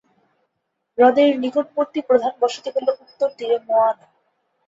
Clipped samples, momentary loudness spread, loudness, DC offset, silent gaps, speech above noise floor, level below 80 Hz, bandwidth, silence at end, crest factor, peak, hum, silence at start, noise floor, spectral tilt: under 0.1%; 9 LU; -19 LUFS; under 0.1%; none; 57 dB; -70 dBFS; 7.8 kHz; 0.75 s; 18 dB; -2 dBFS; none; 1 s; -76 dBFS; -4 dB/octave